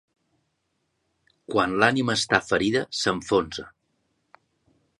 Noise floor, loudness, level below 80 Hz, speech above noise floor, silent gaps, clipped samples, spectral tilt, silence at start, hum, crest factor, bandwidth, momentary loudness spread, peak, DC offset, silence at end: -75 dBFS; -23 LUFS; -56 dBFS; 52 dB; none; under 0.1%; -4 dB/octave; 1.5 s; none; 24 dB; 11.5 kHz; 7 LU; -4 dBFS; under 0.1%; 1.3 s